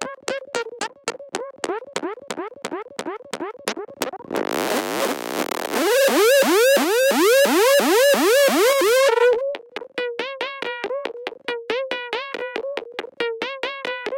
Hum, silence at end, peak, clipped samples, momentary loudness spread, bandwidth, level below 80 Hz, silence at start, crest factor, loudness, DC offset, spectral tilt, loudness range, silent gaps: none; 0 s; -6 dBFS; under 0.1%; 16 LU; 17 kHz; -70 dBFS; 0 s; 16 dB; -20 LUFS; under 0.1%; -2 dB/octave; 13 LU; none